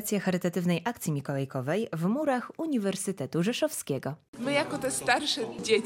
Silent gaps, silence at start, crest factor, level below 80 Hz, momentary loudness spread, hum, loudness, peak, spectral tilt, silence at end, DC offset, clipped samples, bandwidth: 4.28-4.33 s; 0 s; 18 dB; -68 dBFS; 6 LU; none; -30 LUFS; -12 dBFS; -4.5 dB/octave; 0 s; under 0.1%; under 0.1%; 16.5 kHz